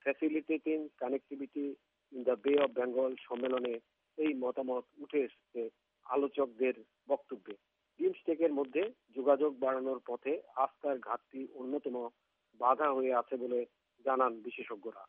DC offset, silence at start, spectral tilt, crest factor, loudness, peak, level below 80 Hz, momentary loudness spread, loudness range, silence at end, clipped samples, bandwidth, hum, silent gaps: under 0.1%; 0.05 s; -3 dB/octave; 20 dB; -35 LUFS; -14 dBFS; under -90 dBFS; 13 LU; 3 LU; 0.05 s; under 0.1%; 3.8 kHz; none; none